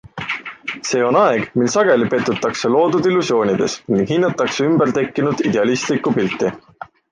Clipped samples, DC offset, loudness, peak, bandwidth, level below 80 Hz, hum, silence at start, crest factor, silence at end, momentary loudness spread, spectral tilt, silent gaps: under 0.1%; under 0.1%; -17 LUFS; -2 dBFS; 9.8 kHz; -56 dBFS; none; 0.05 s; 14 dB; 0.25 s; 9 LU; -5 dB/octave; none